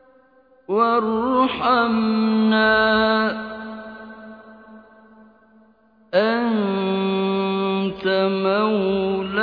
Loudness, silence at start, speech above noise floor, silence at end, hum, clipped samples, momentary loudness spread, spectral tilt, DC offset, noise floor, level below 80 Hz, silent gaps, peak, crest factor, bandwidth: -20 LUFS; 0.7 s; 37 dB; 0 s; none; under 0.1%; 16 LU; -8.5 dB/octave; under 0.1%; -55 dBFS; -54 dBFS; none; -6 dBFS; 16 dB; 5 kHz